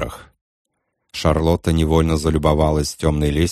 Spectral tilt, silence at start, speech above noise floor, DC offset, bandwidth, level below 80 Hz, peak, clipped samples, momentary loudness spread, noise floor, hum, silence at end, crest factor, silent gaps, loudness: -6 dB/octave; 0 s; 33 dB; under 0.1%; 14 kHz; -28 dBFS; -2 dBFS; under 0.1%; 5 LU; -50 dBFS; none; 0 s; 16 dB; 0.41-0.65 s; -18 LUFS